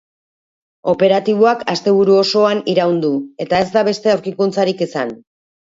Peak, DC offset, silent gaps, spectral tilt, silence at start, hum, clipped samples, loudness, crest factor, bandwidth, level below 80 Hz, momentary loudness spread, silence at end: 0 dBFS; under 0.1%; none; -5.5 dB/octave; 0.85 s; none; under 0.1%; -15 LUFS; 16 dB; 7.8 kHz; -56 dBFS; 8 LU; 0.6 s